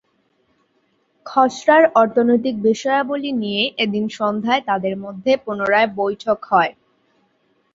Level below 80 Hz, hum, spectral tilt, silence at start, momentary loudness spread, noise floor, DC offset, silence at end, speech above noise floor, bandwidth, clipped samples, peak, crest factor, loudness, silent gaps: -64 dBFS; none; -5 dB/octave; 1.25 s; 8 LU; -64 dBFS; under 0.1%; 1.05 s; 47 dB; 7.8 kHz; under 0.1%; -2 dBFS; 18 dB; -18 LUFS; none